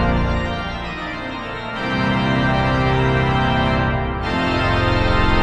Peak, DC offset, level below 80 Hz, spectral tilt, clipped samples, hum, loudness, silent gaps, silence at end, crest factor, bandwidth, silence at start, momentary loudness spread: -4 dBFS; under 0.1%; -26 dBFS; -7 dB/octave; under 0.1%; none; -19 LUFS; none; 0 s; 14 dB; 9 kHz; 0 s; 9 LU